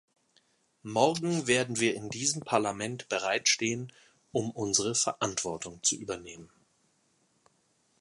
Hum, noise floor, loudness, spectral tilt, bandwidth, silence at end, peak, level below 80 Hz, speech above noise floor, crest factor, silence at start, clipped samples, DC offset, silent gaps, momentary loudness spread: none; -71 dBFS; -29 LUFS; -2.5 dB/octave; 11.5 kHz; 1.55 s; -10 dBFS; -68 dBFS; 41 dB; 22 dB; 0.85 s; under 0.1%; under 0.1%; none; 12 LU